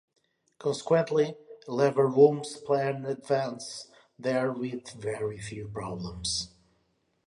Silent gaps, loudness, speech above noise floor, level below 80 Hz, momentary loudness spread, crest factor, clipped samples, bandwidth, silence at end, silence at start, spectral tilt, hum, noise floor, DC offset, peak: none; -29 LUFS; 45 dB; -60 dBFS; 15 LU; 20 dB; under 0.1%; 11.5 kHz; 0.8 s; 0.6 s; -5 dB/octave; none; -73 dBFS; under 0.1%; -8 dBFS